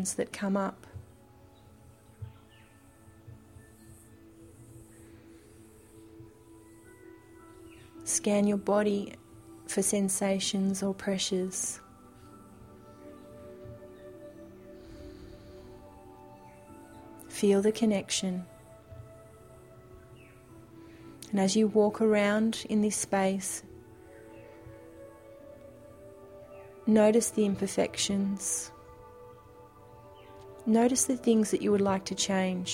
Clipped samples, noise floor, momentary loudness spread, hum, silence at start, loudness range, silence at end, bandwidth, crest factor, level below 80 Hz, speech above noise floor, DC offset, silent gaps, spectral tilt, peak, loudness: under 0.1%; -57 dBFS; 26 LU; none; 0 s; 20 LU; 0 s; 16.5 kHz; 20 dB; -62 dBFS; 29 dB; under 0.1%; none; -4.5 dB/octave; -12 dBFS; -28 LUFS